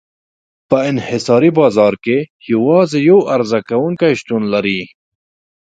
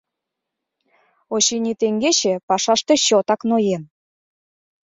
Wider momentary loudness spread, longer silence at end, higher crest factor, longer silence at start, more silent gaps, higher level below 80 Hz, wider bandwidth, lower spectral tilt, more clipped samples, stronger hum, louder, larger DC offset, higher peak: about the same, 8 LU vs 6 LU; second, 0.8 s vs 1 s; about the same, 14 dB vs 18 dB; second, 0.7 s vs 1.3 s; about the same, 2.30-2.40 s vs 2.43-2.48 s; first, -56 dBFS vs -66 dBFS; first, 9.2 kHz vs 7.8 kHz; first, -6.5 dB/octave vs -2.5 dB/octave; neither; neither; first, -14 LUFS vs -18 LUFS; neither; first, 0 dBFS vs -4 dBFS